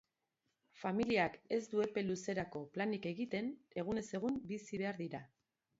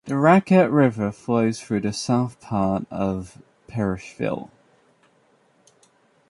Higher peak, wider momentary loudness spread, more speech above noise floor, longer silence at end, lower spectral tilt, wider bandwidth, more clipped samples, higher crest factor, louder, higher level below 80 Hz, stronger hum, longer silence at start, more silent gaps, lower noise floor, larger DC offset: second, -20 dBFS vs -2 dBFS; second, 9 LU vs 12 LU; first, 47 dB vs 40 dB; second, 0.55 s vs 1.85 s; second, -5 dB/octave vs -7 dB/octave; second, 7.6 kHz vs 11.5 kHz; neither; about the same, 22 dB vs 20 dB; second, -40 LUFS vs -22 LUFS; second, -72 dBFS vs -52 dBFS; neither; first, 0.75 s vs 0.05 s; neither; first, -86 dBFS vs -61 dBFS; neither